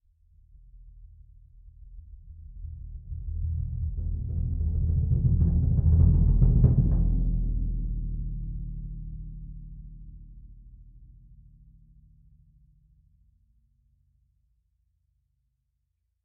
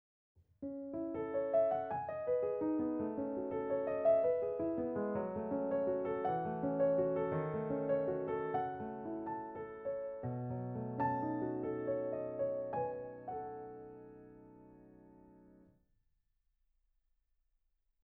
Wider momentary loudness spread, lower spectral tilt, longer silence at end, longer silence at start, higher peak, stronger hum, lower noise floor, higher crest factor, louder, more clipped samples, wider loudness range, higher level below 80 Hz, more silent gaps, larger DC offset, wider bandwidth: first, 26 LU vs 12 LU; first, -16 dB/octave vs -8.5 dB/octave; first, 5.2 s vs 2.6 s; first, 0.75 s vs 0.6 s; first, -6 dBFS vs -22 dBFS; neither; about the same, -77 dBFS vs -80 dBFS; first, 22 dB vs 16 dB; first, -27 LUFS vs -38 LUFS; neither; first, 22 LU vs 8 LU; first, -30 dBFS vs -70 dBFS; neither; neither; second, 1.3 kHz vs 3.8 kHz